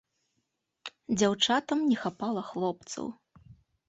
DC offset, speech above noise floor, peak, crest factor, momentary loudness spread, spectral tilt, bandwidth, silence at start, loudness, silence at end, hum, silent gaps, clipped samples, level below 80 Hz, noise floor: under 0.1%; 51 dB; -10 dBFS; 22 dB; 17 LU; -4 dB/octave; 8.4 kHz; 0.85 s; -29 LUFS; 0.35 s; none; none; under 0.1%; -68 dBFS; -80 dBFS